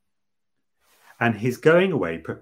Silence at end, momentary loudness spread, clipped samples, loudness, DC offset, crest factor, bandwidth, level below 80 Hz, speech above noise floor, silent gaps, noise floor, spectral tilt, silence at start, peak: 0.05 s; 8 LU; under 0.1%; -21 LUFS; under 0.1%; 20 dB; 16 kHz; -62 dBFS; 64 dB; none; -85 dBFS; -7 dB/octave; 1.2 s; -2 dBFS